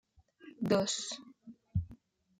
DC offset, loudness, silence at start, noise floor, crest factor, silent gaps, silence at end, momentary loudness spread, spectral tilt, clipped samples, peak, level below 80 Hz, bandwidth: under 0.1%; -35 LUFS; 0.45 s; -59 dBFS; 22 dB; none; 0.45 s; 22 LU; -4.5 dB/octave; under 0.1%; -16 dBFS; -58 dBFS; 15.5 kHz